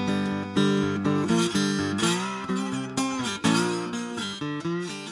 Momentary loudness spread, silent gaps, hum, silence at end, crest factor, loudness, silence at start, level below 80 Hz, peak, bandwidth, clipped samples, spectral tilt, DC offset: 7 LU; none; none; 0 s; 16 dB; -26 LUFS; 0 s; -62 dBFS; -10 dBFS; 11.5 kHz; under 0.1%; -4.5 dB/octave; under 0.1%